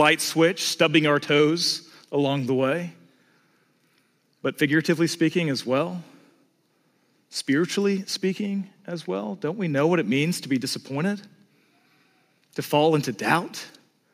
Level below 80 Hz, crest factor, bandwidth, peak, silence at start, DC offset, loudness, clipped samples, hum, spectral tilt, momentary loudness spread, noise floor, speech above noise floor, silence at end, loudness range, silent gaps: -78 dBFS; 22 dB; 15.5 kHz; -4 dBFS; 0 s; under 0.1%; -24 LUFS; under 0.1%; none; -4.5 dB/octave; 13 LU; -66 dBFS; 43 dB; 0.45 s; 4 LU; none